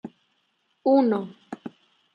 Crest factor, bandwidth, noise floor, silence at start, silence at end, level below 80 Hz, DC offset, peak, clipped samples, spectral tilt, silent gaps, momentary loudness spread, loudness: 18 dB; 5.2 kHz; -71 dBFS; 0.05 s; 0.45 s; -78 dBFS; under 0.1%; -8 dBFS; under 0.1%; -8.5 dB/octave; none; 22 LU; -23 LUFS